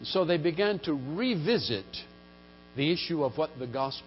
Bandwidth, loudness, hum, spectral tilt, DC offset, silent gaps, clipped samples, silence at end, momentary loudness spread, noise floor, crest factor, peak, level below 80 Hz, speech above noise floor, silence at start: 5.8 kHz; -29 LUFS; 60 Hz at -55 dBFS; -9.5 dB/octave; under 0.1%; none; under 0.1%; 0 s; 13 LU; -53 dBFS; 16 dB; -14 dBFS; -60 dBFS; 24 dB; 0 s